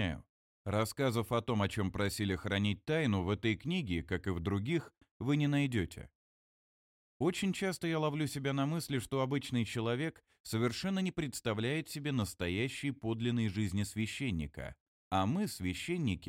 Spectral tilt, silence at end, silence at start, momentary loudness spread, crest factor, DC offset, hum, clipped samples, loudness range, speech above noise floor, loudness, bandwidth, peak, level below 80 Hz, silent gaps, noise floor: -5.5 dB/octave; 0 s; 0 s; 5 LU; 18 dB; under 0.1%; none; under 0.1%; 2 LU; over 55 dB; -35 LUFS; 16.5 kHz; -18 dBFS; -58 dBFS; 0.29-0.65 s, 5.11-5.20 s, 6.15-7.20 s, 10.40-10.44 s, 14.80-15.11 s; under -90 dBFS